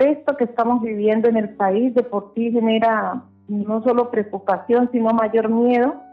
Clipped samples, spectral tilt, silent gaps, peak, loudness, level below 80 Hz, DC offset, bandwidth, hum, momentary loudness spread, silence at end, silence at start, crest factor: under 0.1%; -9 dB/octave; none; -6 dBFS; -19 LUFS; -62 dBFS; under 0.1%; 4.7 kHz; none; 6 LU; 0.05 s; 0 s; 12 dB